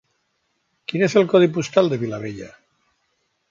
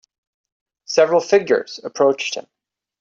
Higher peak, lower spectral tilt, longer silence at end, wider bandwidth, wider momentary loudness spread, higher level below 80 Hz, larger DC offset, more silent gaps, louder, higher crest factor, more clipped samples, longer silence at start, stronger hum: about the same, -2 dBFS vs -2 dBFS; first, -6 dB/octave vs -3.5 dB/octave; first, 1.05 s vs 0.6 s; about the same, 7.6 kHz vs 7.8 kHz; first, 20 LU vs 12 LU; first, -62 dBFS vs -70 dBFS; neither; neither; about the same, -19 LUFS vs -18 LUFS; about the same, 20 dB vs 18 dB; neither; about the same, 0.9 s vs 0.9 s; neither